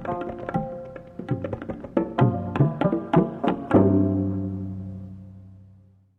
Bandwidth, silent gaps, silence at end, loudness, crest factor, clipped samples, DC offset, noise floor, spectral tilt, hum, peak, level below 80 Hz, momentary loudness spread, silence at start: 4.3 kHz; none; 0.55 s; -24 LUFS; 20 dB; under 0.1%; under 0.1%; -54 dBFS; -10.5 dB/octave; none; -4 dBFS; -52 dBFS; 18 LU; 0 s